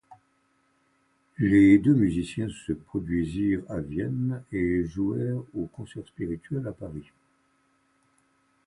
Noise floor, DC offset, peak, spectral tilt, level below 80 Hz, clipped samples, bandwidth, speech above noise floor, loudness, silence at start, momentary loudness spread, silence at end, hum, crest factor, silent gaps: -69 dBFS; under 0.1%; -8 dBFS; -8 dB/octave; -50 dBFS; under 0.1%; 10.5 kHz; 43 dB; -26 LUFS; 0.1 s; 17 LU; 1.65 s; none; 20 dB; none